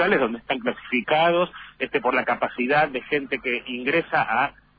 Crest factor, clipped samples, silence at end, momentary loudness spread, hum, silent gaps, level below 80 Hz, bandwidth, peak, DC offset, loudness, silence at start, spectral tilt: 16 dB; under 0.1%; 0.3 s; 7 LU; none; none; -58 dBFS; 5 kHz; -8 dBFS; under 0.1%; -23 LUFS; 0 s; -8 dB/octave